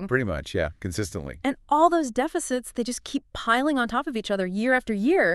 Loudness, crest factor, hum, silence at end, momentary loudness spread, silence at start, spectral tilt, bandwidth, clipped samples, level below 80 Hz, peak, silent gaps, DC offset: -25 LUFS; 18 dB; none; 0 s; 9 LU; 0 s; -5 dB/octave; 13.5 kHz; under 0.1%; -46 dBFS; -6 dBFS; none; under 0.1%